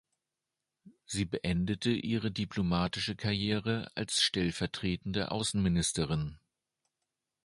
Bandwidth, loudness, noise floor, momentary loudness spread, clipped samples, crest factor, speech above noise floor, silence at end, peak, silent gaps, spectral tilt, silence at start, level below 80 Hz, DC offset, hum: 11.5 kHz; -32 LUFS; -89 dBFS; 6 LU; under 0.1%; 20 dB; 57 dB; 1.1 s; -14 dBFS; none; -4.5 dB/octave; 0.85 s; -52 dBFS; under 0.1%; none